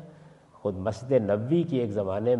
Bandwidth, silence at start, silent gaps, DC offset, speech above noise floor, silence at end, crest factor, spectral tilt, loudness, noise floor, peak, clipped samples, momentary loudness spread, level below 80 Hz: 9.2 kHz; 0 s; none; under 0.1%; 27 dB; 0 s; 18 dB; -8.5 dB/octave; -27 LUFS; -53 dBFS; -10 dBFS; under 0.1%; 8 LU; -68 dBFS